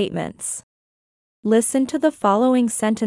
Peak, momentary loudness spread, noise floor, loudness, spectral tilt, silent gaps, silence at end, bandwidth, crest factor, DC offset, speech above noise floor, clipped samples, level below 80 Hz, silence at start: -4 dBFS; 11 LU; under -90 dBFS; -20 LUFS; -4.5 dB/octave; 0.63-1.43 s; 0 s; 12 kHz; 16 dB; under 0.1%; over 71 dB; under 0.1%; -62 dBFS; 0 s